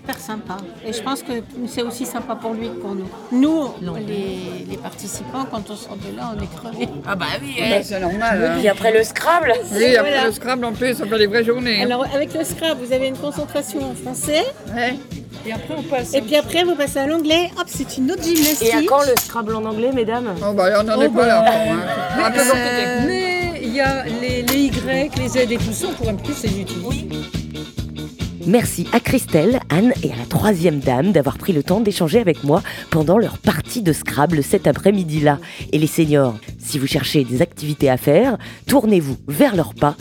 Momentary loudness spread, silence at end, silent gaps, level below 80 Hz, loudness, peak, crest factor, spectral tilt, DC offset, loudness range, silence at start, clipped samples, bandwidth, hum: 13 LU; 0.05 s; none; -42 dBFS; -18 LUFS; 0 dBFS; 18 dB; -5 dB/octave; under 0.1%; 7 LU; 0.05 s; under 0.1%; 19 kHz; none